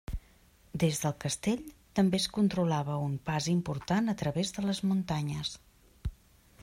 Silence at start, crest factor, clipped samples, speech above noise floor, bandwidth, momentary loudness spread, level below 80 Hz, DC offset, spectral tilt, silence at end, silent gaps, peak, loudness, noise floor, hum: 0.1 s; 16 dB; under 0.1%; 31 dB; 16 kHz; 15 LU; -50 dBFS; under 0.1%; -5.5 dB/octave; 0 s; none; -16 dBFS; -31 LUFS; -61 dBFS; none